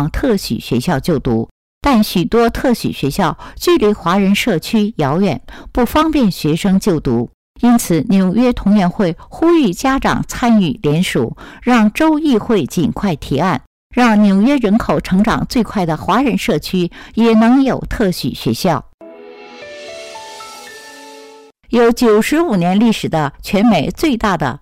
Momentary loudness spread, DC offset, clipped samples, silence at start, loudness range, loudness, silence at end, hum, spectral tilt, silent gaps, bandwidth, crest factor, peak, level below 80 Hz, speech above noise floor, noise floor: 10 LU; 0.2%; under 0.1%; 0 s; 3 LU; -14 LUFS; 0.05 s; none; -6 dB/octave; 1.51-1.81 s, 7.34-7.55 s, 13.67-13.90 s, 18.94-18.98 s; 16 kHz; 8 dB; -6 dBFS; -34 dBFS; 26 dB; -40 dBFS